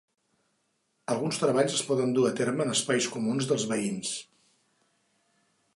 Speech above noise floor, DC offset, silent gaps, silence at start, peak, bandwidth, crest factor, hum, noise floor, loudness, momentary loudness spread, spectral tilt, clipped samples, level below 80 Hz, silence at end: 47 dB; under 0.1%; none; 1.1 s; -12 dBFS; 11.5 kHz; 18 dB; none; -75 dBFS; -28 LUFS; 8 LU; -4 dB/octave; under 0.1%; -76 dBFS; 1.55 s